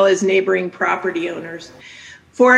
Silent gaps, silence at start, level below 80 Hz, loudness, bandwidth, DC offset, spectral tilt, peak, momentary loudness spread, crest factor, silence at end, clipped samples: none; 0 s; -64 dBFS; -18 LUFS; 9.8 kHz; under 0.1%; -4.5 dB/octave; 0 dBFS; 21 LU; 16 dB; 0 s; under 0.1%